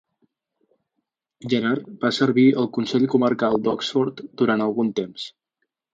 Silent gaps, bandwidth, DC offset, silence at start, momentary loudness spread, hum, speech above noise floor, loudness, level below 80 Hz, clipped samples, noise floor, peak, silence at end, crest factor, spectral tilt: none; 7.8 kHz; under 0.1%; 1.45 s; 11 LU; none; 58 dB; -21 LUFS; -64 dBFS; under 0.1%; -79 dBFS; -4 dBFS; 0.65 s; 18 dB; -6 dB/octave